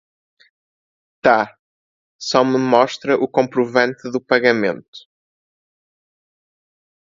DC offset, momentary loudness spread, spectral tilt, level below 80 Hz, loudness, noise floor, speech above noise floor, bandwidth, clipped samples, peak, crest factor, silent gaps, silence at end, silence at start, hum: under 0.1%; 10 LU; -5 dB/octave; -64 dBFS; -17 LUFS; under -90 dBFS; over 73 dB; 7.8 kHz; under 0.1%; 0 dBFS; 20 dB; 1.59-2.19 s, 4.88-4.93 s; 2.15 s; 1.25 s; none